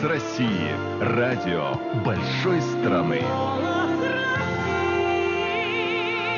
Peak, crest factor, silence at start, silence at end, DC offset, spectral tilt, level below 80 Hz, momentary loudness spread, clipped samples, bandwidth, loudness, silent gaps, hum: -10 dBFS; 12 dB; 0 s; 0 s; under 0.1%; -4.5 dB/octave; -60 dBFS; 3 LU; under 0.1%; 7.2 kHz; -24 LUFS; none; none